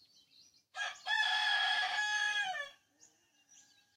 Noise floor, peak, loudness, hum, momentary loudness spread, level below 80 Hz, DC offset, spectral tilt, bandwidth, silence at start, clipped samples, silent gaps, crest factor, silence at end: -68 dBFS; -22 dBFS; -33 LUFS; none; 12 LU; -90 dBFS; under 0.1%; 3 dB/octave; 15.5 kHz; 0.75 s; under 0.1%; none; 16 dB; 1.25 s